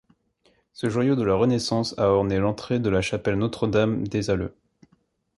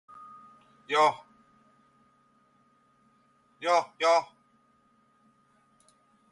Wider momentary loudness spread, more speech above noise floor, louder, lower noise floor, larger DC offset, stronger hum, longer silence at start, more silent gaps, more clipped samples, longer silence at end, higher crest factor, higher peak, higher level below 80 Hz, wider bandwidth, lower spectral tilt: second, 6 LU vs 25 LU; about the same, 43 dB vs 41 dB; about the same, -24 LUFS vs -26 LUFS; about the same, -66 dBFS vs -67 dBFS; neither; neither; about the same, 0.8 s vs 0.9 s; neither; neither; second, 0.9 s vs 2.05 s; about the same, 18 dB vs 22 dB; first, -8 dBFS vs -12 dBFS; first, -46 dBFS vs -84 dBFS; about the same, 11.5 kHz vs 11.5 kHz; first, -6.5 dB/octave vs -2 dB/octave